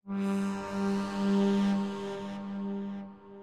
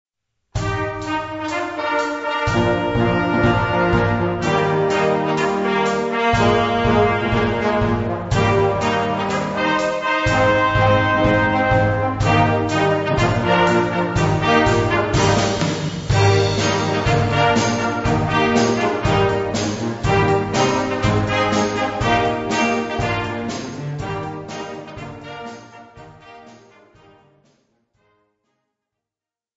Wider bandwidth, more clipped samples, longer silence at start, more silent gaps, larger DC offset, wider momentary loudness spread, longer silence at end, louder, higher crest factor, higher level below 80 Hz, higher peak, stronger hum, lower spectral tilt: first, 10.5 kHz vs 8 kHz; neither; second, 0.05 s vs 0.55 s; neither; first, 0.1% vs under 0.1%; about the same, 11 LU vs 9 LU; second, 0 s vs 3.05 s; second, -32 LUFS vs -18 LUFS; about the same, 12 dB vs 16 dB; second, -66 dBFS vs -36 dBFS; second, -18 dBFS vs -2 dBFS; neither; first, -7 dB/octave vs -5.5 dB/octave